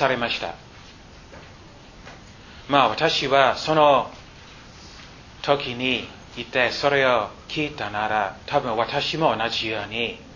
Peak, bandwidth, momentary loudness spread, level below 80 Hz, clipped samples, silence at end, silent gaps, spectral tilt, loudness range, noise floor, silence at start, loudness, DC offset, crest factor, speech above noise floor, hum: -2 dBFS; 7.4 kHz; 24 LU; -50 dBFS; under 0.1%; 0 s; none; -4.5 dB/octave; 3 LU; -45 dBFS; 0 s; -22 LUFS; under 0.1%; 22 dB; 23 dB; none